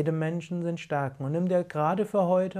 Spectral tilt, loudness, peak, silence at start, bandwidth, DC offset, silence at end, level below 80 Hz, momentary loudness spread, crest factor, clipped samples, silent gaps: -8 dB/octave; -28 LUFS; -14 dBFS; 0 s; 11.5 kHz; under 0.1%; 0 s; -70 dBFS; 7 LU; 14 dB; under 0.1%; none